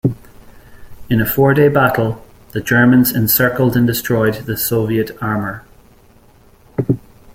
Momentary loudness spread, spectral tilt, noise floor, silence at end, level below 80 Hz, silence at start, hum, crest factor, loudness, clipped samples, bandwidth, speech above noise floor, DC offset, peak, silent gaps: 14 LU; -6 dB/octave; -47 dBFS; 0.35 s; -42 dBFS; 0.05 s; none; 16 dB; -15 LUFS; under 0.1%; 16.5 kHz; 33 dB; under 0.1%; 0 dBFS; none